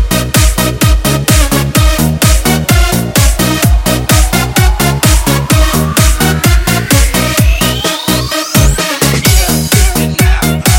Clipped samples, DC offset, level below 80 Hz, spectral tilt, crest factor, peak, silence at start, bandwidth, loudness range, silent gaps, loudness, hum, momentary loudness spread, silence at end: 0.4%; under 0.1%; -14 dBFS; -4 dB/octave; 8 dB; 0 dBFS; 0 s; 17.5 kHz; 1 LU; none; -9 LUFS; none; 2 LU; 0 s